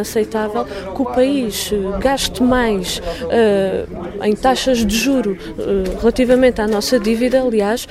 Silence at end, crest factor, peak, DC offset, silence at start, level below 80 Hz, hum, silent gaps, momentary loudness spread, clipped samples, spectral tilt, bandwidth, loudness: 0 s; 16 dB; 0 dBFS; under 0.1%; 0 s; -34 dBFS; none; none; 8 LU; under 0.1%; -4.5 dB/octave; 16 kHz; -17 LUFS